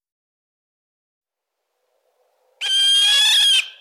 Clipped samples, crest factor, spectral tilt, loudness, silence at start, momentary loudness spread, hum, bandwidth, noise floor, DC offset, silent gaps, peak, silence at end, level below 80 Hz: under 0.1%; 12 dB; 9 dB/octave; -13 LUFS; 2.6 s; 7 LU; none; 16.5 kHz; -80 dBFS; under 0.1%; none; -8 dBFS; 0.1 s; under -90 dBFS